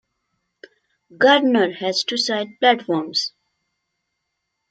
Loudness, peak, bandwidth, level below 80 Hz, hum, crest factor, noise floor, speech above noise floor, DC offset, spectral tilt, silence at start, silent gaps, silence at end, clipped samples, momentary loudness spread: -19 LUFS; -2 dBFS; 9.2 kHz; -74 dBFS; none; 20 dB; -77 dBFS; 58 dB; under 0.1%; -3 dB/octave; 1.2 s; none; 1.45 s; under 0.1%; 8 LU